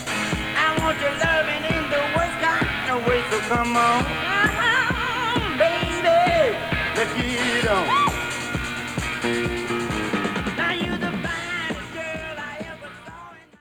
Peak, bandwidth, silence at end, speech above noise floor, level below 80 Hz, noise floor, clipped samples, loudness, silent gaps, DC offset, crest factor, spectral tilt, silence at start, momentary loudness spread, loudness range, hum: -6 dBFS; over 20 kHz; 0.2 s; 22 dB; -40 dBFS; -43 dBFS; under 0.1%; -22 LUFS; none; under 0.1%; 18 dB; -4 dB/octave; 0 s; 11 LU; 6 LU; none